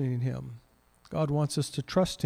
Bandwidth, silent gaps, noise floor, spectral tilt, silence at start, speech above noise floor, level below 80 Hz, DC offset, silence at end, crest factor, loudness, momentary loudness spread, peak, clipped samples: 15.5 kHz; none; -62 dBFS; -6 dB/octave; 0 s; 33 dB; -56 dBFS; under 0.1%; 0 s; 18 dB; -31 LUFS; 14 LU; -12 dBFS; under 0.1%